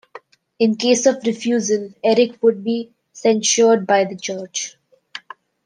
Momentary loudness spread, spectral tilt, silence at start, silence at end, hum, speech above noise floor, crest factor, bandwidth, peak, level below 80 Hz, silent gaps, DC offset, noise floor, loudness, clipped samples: 17 LU; -3 dB/octave; 0.15 s; 0.45 s; none; 26 dB; 18 dB; 10 kHz; -2 dBFS; -70 dBFS; none; under 0.1%; -43 dBFS; -18 LUFS; under 0.1%